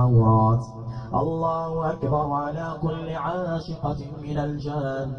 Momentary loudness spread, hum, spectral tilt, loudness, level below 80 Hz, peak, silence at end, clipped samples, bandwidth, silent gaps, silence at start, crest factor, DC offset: 11 LU; none; -9.5 dB/octave; -25 LUFS; -44 dBFS; -8 dBFS; 0 s; under 0.1%; 6.4 kHz; none; 0 s; 16 dB; under 0.1%